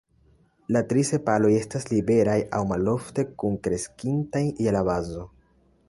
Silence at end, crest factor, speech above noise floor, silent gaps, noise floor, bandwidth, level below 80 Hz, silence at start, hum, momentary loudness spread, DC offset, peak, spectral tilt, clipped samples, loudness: 0.6 s; 18 dB; 37 dB; none; -61 dBFS; 11.5 kHz; -50 dBFS; 0.7 s; none; 8 LU; under 0.1%; -6 dBFS; -6.5 dB/octave; under 0.1%; -25 LUFS